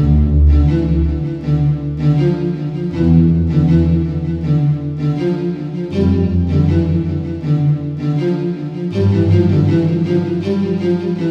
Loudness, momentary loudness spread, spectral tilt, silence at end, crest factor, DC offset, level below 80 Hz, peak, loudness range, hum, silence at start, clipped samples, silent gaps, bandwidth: -15 LUFS; 8 LU; -10 dB/octave; 0 s; 12 dB; under 0.1%; -22 dBFS; -2 dBFS; 2 LU; none; 0 s; under 0.1%; none; 6.2 kHz